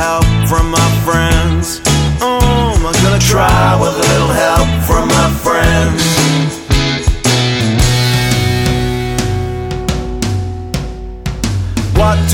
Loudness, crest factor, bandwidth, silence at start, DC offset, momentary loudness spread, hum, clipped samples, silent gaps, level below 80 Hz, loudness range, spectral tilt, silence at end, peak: -12 LUFS; 12 dB; 17.5 kHz; 0 s; under 0.1%; 8 LU; none; under 0.1%; none; -20 dBFS; 6 LU; -4.5 dB/octave; 0 s; 0 dBFS